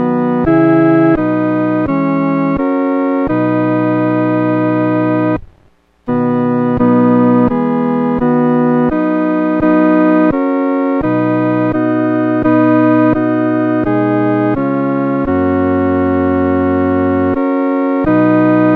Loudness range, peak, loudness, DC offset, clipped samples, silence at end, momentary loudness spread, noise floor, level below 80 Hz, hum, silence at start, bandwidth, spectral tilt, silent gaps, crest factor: 2 LU; 0 dBFS; -13 LUFS; 0.1%; under 0.1%; 0 s; 4 LU; -50 dBFS; -40 dBFS; none; 0 s; 4.5 kHz; -10.5 dB/octave; none; 12 dB